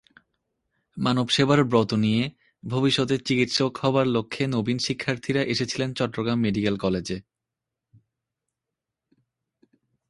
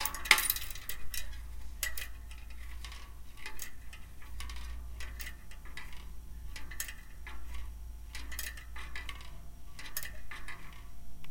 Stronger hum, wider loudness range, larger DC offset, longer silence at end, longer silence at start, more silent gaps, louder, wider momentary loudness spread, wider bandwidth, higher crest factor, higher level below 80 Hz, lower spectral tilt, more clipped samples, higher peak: neither; about the same, 8 LU vs 7 LU; neither; first, 2.9 s vs 0 s; first, 0.95 s vs 0 s; neither; first, -24 LUFS vs -37 LUFS; second, 8 LU vs 15 LU; second, 11.5 kHz vs 17 kHz; second, 22 dB vs 34 dB; second, -56 dBFS vs -46 dBFS; first, -5.5 dB/octave vs -1 dB/octave; neither; about the same, -4 dBFS vs -2 dBFS